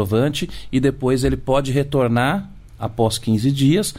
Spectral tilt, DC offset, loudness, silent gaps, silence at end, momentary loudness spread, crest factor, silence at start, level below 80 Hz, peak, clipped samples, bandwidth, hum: -6 dB/octave; under 0.1%; -19 LUFS; none; 0 s; 9 LU; 14 dB; 0 s; -36 dBFS; -6 dBFS; under 0.1%; 16 kHz; none